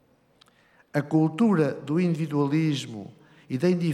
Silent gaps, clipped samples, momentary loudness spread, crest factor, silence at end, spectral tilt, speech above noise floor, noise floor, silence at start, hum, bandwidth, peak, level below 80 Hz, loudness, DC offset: none; under 0.1%; 13 LU; 16 dB; 0 s; -7.5 dB/octave; 37 dB; -61 dBFS; 0.95 s; none; 12.5 kHz; -10 dBFS; -76 dBFS; -25 LUFS; under 0.1%